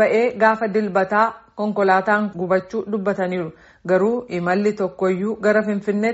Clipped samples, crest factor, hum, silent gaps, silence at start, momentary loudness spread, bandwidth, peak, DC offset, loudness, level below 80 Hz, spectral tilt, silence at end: under 0.1%; 16 dB; none; none; 0 s; 7 LU; 8 kHz; -2 dBFS; under 0.1%; -20 LUFS; -60 dBFS; -5.5 dB/octave; 0 s